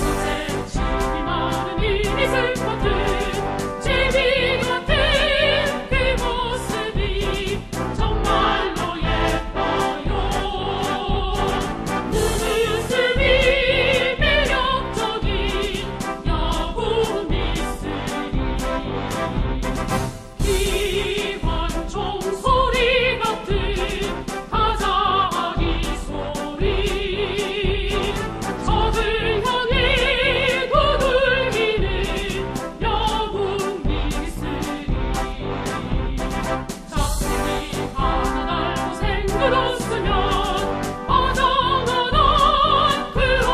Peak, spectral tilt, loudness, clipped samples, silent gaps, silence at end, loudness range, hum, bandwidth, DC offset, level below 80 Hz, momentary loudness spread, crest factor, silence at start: -4 dBFS; -4.5 dB/octave; -21 LUFS; under 0.1%; none; 0 s; 6 LU; none; 15 kHz; under 0.1%; -28 dBFS; 9 LU; 16 dB; 0 s